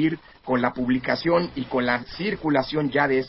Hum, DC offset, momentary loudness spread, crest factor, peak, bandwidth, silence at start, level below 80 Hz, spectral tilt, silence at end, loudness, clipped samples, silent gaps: none; under 0.1%; 5 LU; 18 dB; -6 dBFS; 5.8 kHz; 0 s; -52 dBFS; -10 dB/octave; 0 s; -24 LUFS; under 0.1%; none